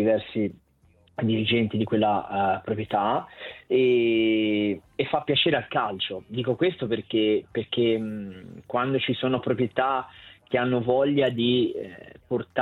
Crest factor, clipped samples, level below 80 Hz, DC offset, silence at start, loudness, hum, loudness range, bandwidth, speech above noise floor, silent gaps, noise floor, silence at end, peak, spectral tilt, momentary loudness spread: 16 dB; under 0.1%; -62 dBFS; under 0.1%; 0 s; -25 LUFS; none; 3 LU; 4.4 kHz; 36 dB; none; -60 dBFS; 0 s; -8 dBFS; -8.5 dB/octave; 9 LU